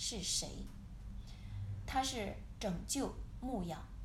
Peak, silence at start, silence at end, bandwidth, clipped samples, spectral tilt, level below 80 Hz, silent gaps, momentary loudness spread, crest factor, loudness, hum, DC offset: -24 dBFS; 0 s; 0 s; 16 kHz; under 0.1%; -3.5 dB/octave; -50 dBFS; none; 15 LU; 18 dB; -41 LUFS; none; under 0.1%